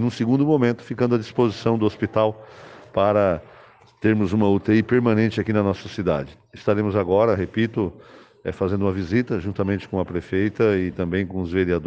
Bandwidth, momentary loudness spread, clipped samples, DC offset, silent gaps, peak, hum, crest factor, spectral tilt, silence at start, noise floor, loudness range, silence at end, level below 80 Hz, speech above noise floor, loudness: 8 kHz; 8 LU; under 0.1%; under 0.1%; none; -6 dBFS; none; 16 dB; -8 dB/octave; 0 s; -50 dBFS; 3 LU; 0 s; -54 dBFS; 29 dB; -22 LUFS